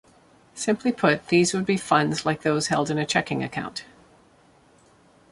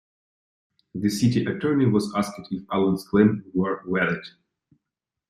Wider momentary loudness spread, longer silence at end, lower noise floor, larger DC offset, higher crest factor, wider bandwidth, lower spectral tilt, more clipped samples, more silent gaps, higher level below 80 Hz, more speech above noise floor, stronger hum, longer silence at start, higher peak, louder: about the same, 11 LU vs 11 LU; first, 1.5 s vs 1 s; second, -57 dBFS vs -86 dBFS; neither; about the same, 20 dB vs 20 dB; second, 11.5 kHz vs 15.5 kHz; second, -4.5 dB/octave vs -6.5 dB/octave; neither; neither; about the same, -62 dBFS vs -58 dBFS; second, 34 dB vs 63 dB; neither; second, 0.55 s vs 0.95 s; about the same, -4 dBFS vs -6 dBFS; about the same, -23 LUFS vs -24 LUFS